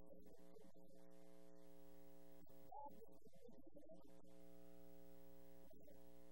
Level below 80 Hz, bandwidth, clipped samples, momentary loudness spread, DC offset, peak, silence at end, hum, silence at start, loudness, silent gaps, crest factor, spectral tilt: -82 dBFS; 16 kHz; under 0.1%; 7 LU; 0.2%; -44 dBFS; 0 s; 60 Hz at -75 dBFS; 0 s; -66 LUFS; none; 18 dB; -6 dB/octave